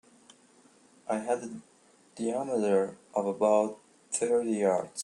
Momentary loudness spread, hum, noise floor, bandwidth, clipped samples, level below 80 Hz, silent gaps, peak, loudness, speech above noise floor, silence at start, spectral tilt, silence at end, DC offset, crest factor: 13 LU; none; -61 dBFS; 11.5 kHz; under 0.1%; -78 dBFS; none; -12 dBFS; -29 LUFS; 32 dB; 1.1 s; -5 dB/octave; 0 s; under 0.1%; 18 dB